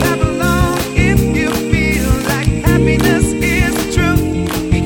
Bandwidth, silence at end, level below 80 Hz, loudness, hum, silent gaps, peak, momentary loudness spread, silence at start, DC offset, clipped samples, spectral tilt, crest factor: 19 kHz; 0 s; -22 dBFS; -14 LUFS; none; none; 0 dBFS; 3 LU; 0 s; under 0.1%; under 0.1%; -5.5 dB/octave; 14 dB